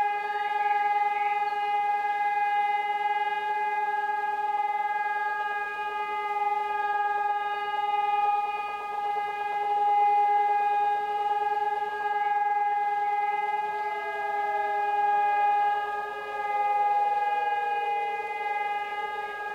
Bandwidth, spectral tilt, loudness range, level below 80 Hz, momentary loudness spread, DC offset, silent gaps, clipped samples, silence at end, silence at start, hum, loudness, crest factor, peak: 8.4 kHz; -2 dB/octave; 3 LU; -72 dBFS; 6 LU; under 0.1%; none; under 0.1%; 0 s; 0 s; none; -27 LUFS; 12 dB; -16 dBFS